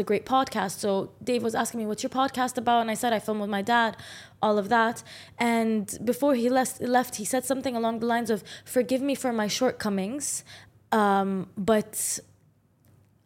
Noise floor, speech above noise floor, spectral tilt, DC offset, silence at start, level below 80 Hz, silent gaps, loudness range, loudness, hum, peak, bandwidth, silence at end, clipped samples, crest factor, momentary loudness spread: -63 dBFS; 37 dB; -4 dB/octave; under 0.1%; 0 s; -66 dBFS; none; 2 LU; -26 LUFS; none; -10 dBFS; 16.5 kHz; 1.05 s; under 0.1%; 18 dB; 6 LU